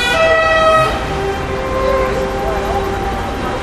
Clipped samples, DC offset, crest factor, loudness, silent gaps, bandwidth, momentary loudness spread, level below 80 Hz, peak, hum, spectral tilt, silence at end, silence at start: under 0.1%; under 0.1%; 14 dB; -15 LUFS; none; 15 kHz; 9 LU; -26 dBFS; 0 dBFS; none; -4.5 dB/octave; 0 s; 0 s